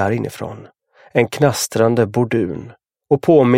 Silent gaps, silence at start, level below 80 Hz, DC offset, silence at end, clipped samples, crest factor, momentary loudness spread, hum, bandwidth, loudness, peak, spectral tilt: none; 0 s; -54 dBFS; under 0.1%; 0 s; under 0.1%; 16 dB; 16 LU; none; 16.5 kHz; -17 LUFS; 0 dBFS; -6 dB/octave